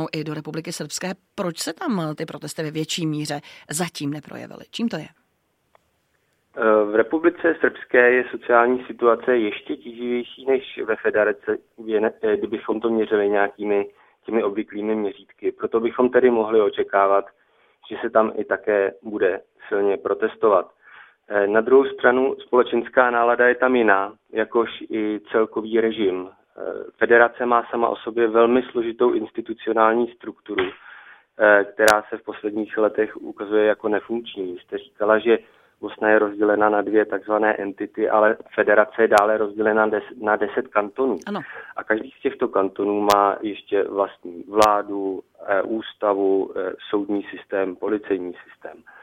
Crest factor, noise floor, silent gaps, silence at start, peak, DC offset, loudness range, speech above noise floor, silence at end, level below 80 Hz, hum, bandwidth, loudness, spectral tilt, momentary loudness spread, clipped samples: 22 dB; -69 dBFS; none; 0 s; 0 dBFS; under 0.1%; 6 LU; 48 dB; 0.3 s; -64 dBFS; none; 16.5 kHz; -21 LUFS; -5 dB/octave; 13 LU; under 0.1%